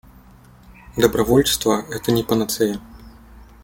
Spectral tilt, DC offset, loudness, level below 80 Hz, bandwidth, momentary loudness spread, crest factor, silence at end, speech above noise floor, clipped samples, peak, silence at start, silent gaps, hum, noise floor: -4.5 dB/octave; under 0.1%; -19 LUFS; -42 dBFS; 17 kHz; 7 LU; 22 dB; 0.2 s; 28 dB; under 0.1%; 0 dBFS; 0.7 s; none; none; -47 dBFS